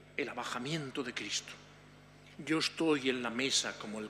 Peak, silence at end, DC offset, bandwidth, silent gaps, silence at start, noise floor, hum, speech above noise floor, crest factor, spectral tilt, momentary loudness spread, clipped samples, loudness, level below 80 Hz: -18 dBFS; 0 s; under 0.1%; 15 kHz; none; 0 s; -57 dBFS; 50 Hz at -60 dBFS; 22 dB; 20 dB; -3 dB/octave; 14 LU; under 0.1%; -34 LUFS; -70 dBFS